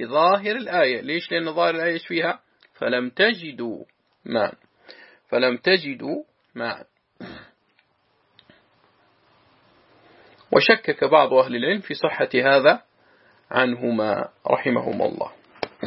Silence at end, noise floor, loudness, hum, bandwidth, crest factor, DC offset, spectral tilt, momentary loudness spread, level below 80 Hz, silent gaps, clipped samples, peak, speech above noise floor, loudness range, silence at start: 0 s; -66 dBFS; -21 LUFS; none; 5.8 kHz; 22 dB; under 0.1%; -9 dB/octave; 16 LU; -70 dBFS; none; under 0.1%; -2 dBFS; 45 dB; 9 LU; 0 s